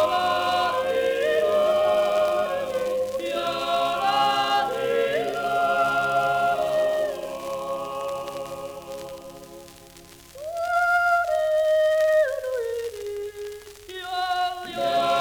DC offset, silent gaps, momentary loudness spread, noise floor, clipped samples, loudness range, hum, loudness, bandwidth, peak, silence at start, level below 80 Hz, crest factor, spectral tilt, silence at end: under 0.1%; none; 15 LU; -47 dBFS; under 0.1%; 7 LU; none; -24 LUFS; over 20 kHz; -10 dBFS; 0 s; -58 dBFS; 14 dB; -3 dB/octave; 0 s